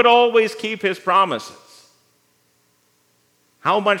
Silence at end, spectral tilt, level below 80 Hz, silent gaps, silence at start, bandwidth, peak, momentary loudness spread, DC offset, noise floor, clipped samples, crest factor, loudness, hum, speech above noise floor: 0 s; -4 dB/octave; -82 dBFS; none; 0 s; 13.5 kHz; 0 dBFS; 12 LU; under 0.1%; -62 dBFS; under 0.1%; 20 dB; -18 LUFS; 60 Hz at -60 dBFS; 45 dB